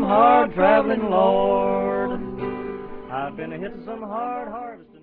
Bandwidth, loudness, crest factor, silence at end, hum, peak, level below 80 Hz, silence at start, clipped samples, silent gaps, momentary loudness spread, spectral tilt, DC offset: 4.5 kHz; -21 LUFS; 16 dB; 0.2 s; none; -4 dBFS; -48 dBFS; 0 s; under 0.1%; none; 17 LU; -10 dB/octave; under 0.1%